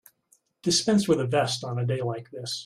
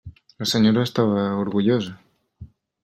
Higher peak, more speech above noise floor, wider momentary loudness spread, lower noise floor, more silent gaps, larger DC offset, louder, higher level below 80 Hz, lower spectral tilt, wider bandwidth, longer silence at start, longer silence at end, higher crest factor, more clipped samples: second, -10 dBFS vs -4 dBFS; first, 41 dB vs 25 dB; first, 11 LU vs 7 LU; first, -66 dBFS vs -45 dBFS; neither; neither; second, -26 LUFS vs -21 LUFS; second, -66 dBFS vs -56 dBFS; second, -4.5 dB/octave vs -6 dB/octave; about the same, 15 kHz vs 14 kHz; first, 0.65 s vs 0.05 s; second, 0 s vs 0.35 s; about the same, 16 dB vs 18 dB; neither